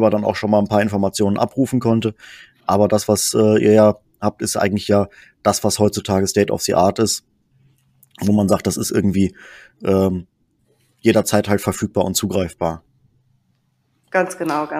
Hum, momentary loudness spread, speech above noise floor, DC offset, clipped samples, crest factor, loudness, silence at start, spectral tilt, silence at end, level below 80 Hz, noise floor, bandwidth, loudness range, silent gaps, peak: none; 8 LU; 48 dB; under 0.1%; under 0.1%; 18 dB; -18 LUFS; 0 s; -5 dB/octave; 0 s; -50 dBFS; -65 dBFS; 15.5 kHz; 4 LU; none; 0 dBFS